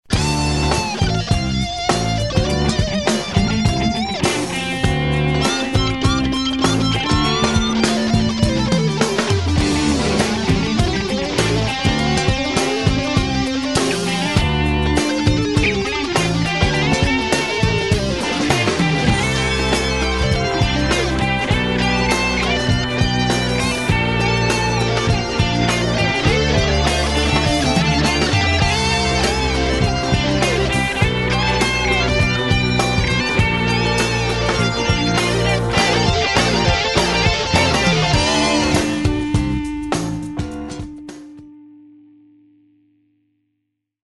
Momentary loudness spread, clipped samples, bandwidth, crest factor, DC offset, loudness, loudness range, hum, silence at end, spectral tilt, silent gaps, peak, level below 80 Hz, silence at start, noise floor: 3 LU; under 0.1%; 12.5 kHz; 16 dB; 0.5%; -17 LUFS; 2 LU; none; 2.15 s; -4.5 dB/octave; none; -2 dBFS; -28 dBFS; 0.1 s; -74 dBFS